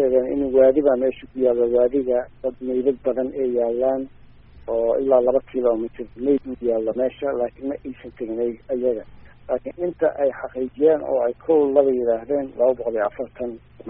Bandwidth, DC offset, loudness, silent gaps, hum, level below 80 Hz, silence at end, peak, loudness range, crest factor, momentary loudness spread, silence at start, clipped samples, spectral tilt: 3.7 kHz; under 0.1%; -22 LUFS; none; none; -50 dBFS; 0 s; -2 dBFS; 6 LU; 18 dB; 12 LU; 0 s; under 0.1%; -6.5 dB/octave